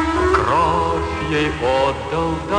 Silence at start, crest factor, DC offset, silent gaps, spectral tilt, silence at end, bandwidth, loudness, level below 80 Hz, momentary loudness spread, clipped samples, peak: 0 s; 16 dB; under 0.1%; none; -6 dB/octave; 0 s; 10 kHz; -18 LUFS; -32 dBFS; 6 LU; under 0.1%; -2 dBFS